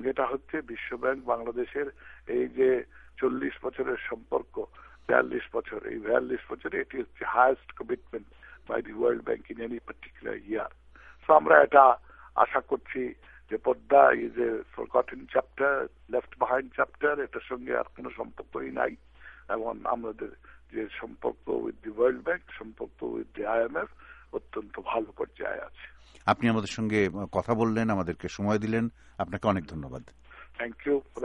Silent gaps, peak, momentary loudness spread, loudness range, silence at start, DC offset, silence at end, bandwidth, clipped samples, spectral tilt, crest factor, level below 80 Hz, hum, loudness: none; -4 dBFS; 16 LU; 10 LU; 0 s; under 0.1%; 0 s; 9.6 kHz; under 0.1%; -6.5 dB/octave; 26 dB; -58 dBFS; none; -29 LUFS